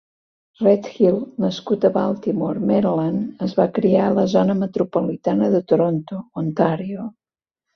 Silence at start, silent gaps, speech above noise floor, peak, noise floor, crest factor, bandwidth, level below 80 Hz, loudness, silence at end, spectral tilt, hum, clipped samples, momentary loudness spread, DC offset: 0.6 s; none; 66 dB; -2 dBFS; -85 dBFS; 18 dB; 6.4 kHz; -60 dBFS; -20 LUFS; 0.65 s; -8.5 dB/octave; none; under 0.1%; 9 LU; under 0.1%